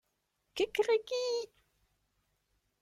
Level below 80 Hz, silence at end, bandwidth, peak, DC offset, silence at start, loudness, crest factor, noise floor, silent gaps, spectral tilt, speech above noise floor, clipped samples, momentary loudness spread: -74 dBFS; 1.35 s; 15 kHz; -18 dBFS; under 0.1%; 0.55 s; -33 LUFS; 18 dB; -81 dBFS; none; -2 dB/octave; 49 dB; under 0.1%; 14 LU